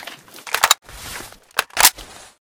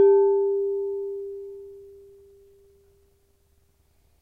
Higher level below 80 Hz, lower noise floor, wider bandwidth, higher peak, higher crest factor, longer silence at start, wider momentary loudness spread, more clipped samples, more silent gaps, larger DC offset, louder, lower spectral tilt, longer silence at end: first, -50 dBFS vs -66 dBFS; second, -39 dBFS vs -64 dBFS; first, over 20 kHz vs 1.6 kHz; first, 0 dBFS vs -10 dBFS; first, 22 dB vs 16 dB; about the same, 0 s vs 0 s; second, 22 LU vs 26 LU; first, 0.1% vs under 0.1%; neither; neither; first, -17 LUFS vs -24 LUFS; second, 1.5 dB/octave vs -8.5 dB/octave; second, 0.4 s vs 2.3 s